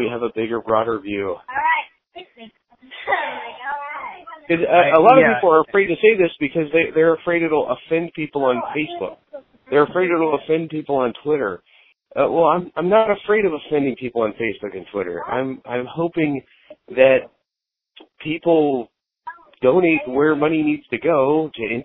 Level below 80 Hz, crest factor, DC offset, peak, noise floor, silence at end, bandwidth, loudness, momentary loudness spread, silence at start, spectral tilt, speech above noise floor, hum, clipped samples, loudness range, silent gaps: -58 dBFS; 18 dB; under 0.1%; 0 dBFS; -84 dBFS; 0 s; 4.1 kHz; -19 LUFS; 14 LU; 0 s; -10 dB/octave; 66 dB; none; under 0.1%; 8 LU; none